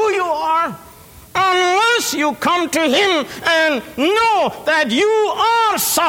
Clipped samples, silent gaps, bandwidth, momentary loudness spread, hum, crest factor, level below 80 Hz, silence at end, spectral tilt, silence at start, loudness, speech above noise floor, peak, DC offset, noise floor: under 0.1%; none; over 20 kHz; 4 LU; none; 12 dB; -54 dBFS; 0 s; -2 dB/octave; 0 s; -15 LUFS; 25 dB; -4 dBFS; under 0.1%; -41 dBFS